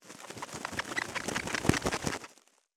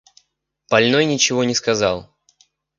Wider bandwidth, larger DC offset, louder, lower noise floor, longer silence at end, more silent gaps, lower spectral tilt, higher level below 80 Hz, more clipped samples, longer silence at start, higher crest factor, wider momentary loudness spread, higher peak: first, over 20 kHz vs 10 kHz; neither; second, -34 LUFS vs -17 LUFS; second, -62 dBFS vs -70 dBFS; second, 0.45 s vs 0.75 s; neither; about the same, -3.5 dB/octave vs -3 dB/octave; about the same, -54 dBFS vs -54 dBFS; neither; second, 0 s vs 0.7 s; first, 28 dB vs 20 dB; first, 13 LU vs 5 LU; second, -8 dBFS vs 0 dBFS